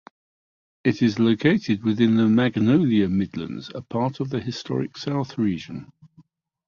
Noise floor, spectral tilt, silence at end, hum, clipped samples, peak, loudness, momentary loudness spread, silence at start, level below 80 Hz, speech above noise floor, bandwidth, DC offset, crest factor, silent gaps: -57 dBFS; -7.5 dB/octave; 0.8 s; none; under 0.1%; -6 dBFS; -22 LUFS; 13 LU; 0.85 s; -54 dBFS; 35 dB; 7 kHz; under 0.1%; 18 dB; none